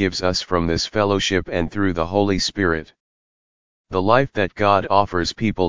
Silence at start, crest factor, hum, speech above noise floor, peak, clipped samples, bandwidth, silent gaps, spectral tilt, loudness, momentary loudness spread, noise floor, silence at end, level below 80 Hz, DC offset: 0 s; 20 dB; none; over 71 dB; 0 dBFS; under 0.1%; 7.6 kHz; 3.00-3.84 s; -5 dB/octave; -20 LUFS; 5 LU; under -90 dBFS; 0 s; -38 dBFS; 1%